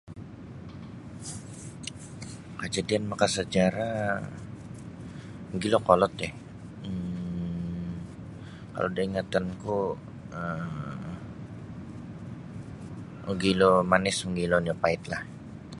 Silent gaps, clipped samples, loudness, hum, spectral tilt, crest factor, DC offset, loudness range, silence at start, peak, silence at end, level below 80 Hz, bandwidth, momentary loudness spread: none; under 0.1%; -29 LUFS; none; -5 dB/octave; 26 dB; under 0.1%; 9 LU; 0.05 s; -4 dBFS; 0 s; -52 dBFS; 11.5 kHz; 19 LU